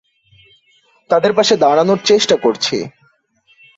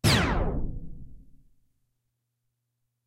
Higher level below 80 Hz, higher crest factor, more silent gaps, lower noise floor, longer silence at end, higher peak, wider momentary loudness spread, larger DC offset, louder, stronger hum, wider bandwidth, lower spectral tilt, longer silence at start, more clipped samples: second, -58 dBFS vs -36 dBFS; second, 14 dB vs 20 dB; neither; second, -57 dBFS vs -80 dBFS; second, 0.9 s vs 1.85 s; first, -2 dBFS vs -10 dBFS; second, 7 LU vs 24 LU; neither; first, -14 LUFS vs -28 LUFS; neither; second, 8 kHz vs 16 kHz; about the same, -3.5 dB/octave vs -4.5 dB/octave; first, 1.1 s vs 0.05 s; neither